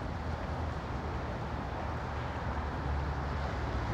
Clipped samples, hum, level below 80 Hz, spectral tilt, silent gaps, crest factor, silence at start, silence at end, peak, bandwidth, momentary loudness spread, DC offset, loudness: under 0.1%; none; -40 dBFS; -7 dB/octave; none; 12 dB; 0 s; 0 s; -24 dBFS; 8.2 kHz; 2 LU; under 0.1%; -37 LUFS